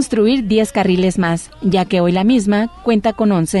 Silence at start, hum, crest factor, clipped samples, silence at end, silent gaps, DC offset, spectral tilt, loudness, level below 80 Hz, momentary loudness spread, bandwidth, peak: 0 s; none; 12 dB; under 0.1%; 0 s; none; under 0.1%; -6 dB/octave; -15 LUFS; -40 dBFS; 4 LU; 12 kHz; -2 dBFS